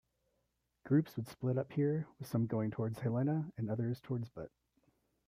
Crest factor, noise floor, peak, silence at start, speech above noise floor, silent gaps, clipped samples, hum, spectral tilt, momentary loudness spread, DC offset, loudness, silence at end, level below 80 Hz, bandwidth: 18 dB; -82 dBFS; -20 dBFS; 0.85 s; 46 dB; none; under 0.1%; none; -9 dB/octave; 8 LU; under 0.1%; -37 LUFS; 0.8 s; -72 dBFS; 15.5 kHz